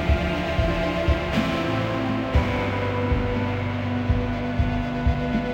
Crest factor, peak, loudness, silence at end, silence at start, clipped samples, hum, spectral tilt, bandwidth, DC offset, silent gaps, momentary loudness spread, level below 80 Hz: 14 dB; -8 dBFS; -24 LUFS; 0 s; 0 s; under 0.1%; none; -7.5 dB/octave; 16 kHz; under 0.1%; none; 2 LU; -30 dBFS